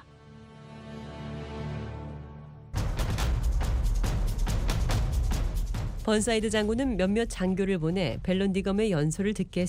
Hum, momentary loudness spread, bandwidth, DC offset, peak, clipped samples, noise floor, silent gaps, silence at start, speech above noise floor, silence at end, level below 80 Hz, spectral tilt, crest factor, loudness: none; 15 LU; 16 kHz; under 0.1%; -10 dBFS; under 0.1%; -50 dBFS; none; 0.1 s; 23 dB; 0 s; -32 dBFS; -6 dB/octave; 18 dB; -29 LUFS